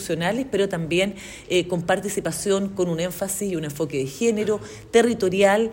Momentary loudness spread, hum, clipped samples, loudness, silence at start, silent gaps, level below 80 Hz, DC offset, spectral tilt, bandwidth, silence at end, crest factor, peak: 8 LU; none; under 0.1%; -23 LUFS; 0 s; none; -52 dBFS; under 0.1%; -4.5 dB/octave; 16.5 kHz; 0 s; 18 dB; -4 dBFS